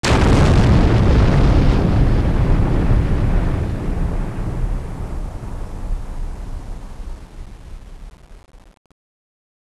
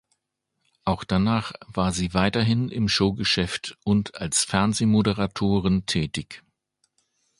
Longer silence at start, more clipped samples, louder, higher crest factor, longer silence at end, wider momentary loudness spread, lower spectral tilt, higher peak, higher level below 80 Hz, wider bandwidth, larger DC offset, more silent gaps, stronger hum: second, 0.05 s vs 0.85 s; neither; first, -17 LUFS vs -24 LUFS; second, 14 dB vs 20 dB; about the same, 1.05 s vs 1 s; first, 22 LU vs 9 LU; first, -7 dB/octave vs -4.5 dB/octave; about the same, -2 dBFS vs -4 dBFS; first, -20 dBFS vs -44 dBFS; about the same, 12 kHz vs 11.5 kHz; neither; neither; neither